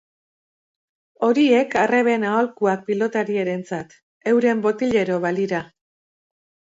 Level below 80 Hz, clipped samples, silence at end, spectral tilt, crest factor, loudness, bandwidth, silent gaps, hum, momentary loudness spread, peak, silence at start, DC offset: -64 dBFS; under 0.1%; 1 s; -6 dB/octave; 16 dB; -20 LUFS; 8 kHz; 4.03-4.21 s; none; 10 LU; -6 dBFS; 1.2 s; under 0.1%